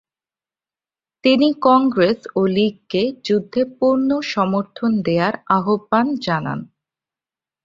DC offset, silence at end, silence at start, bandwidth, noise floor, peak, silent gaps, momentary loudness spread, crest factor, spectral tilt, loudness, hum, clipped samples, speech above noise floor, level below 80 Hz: under 0.1%; 1 s; 1.25 s; 7.4 kHz; under -90 dBFS; -2 dBFS; none; 7 LU; 18 dB; -7 dB/octave; -18 LUFS; none; under 0.1%; over 72 dB; -60 dBFS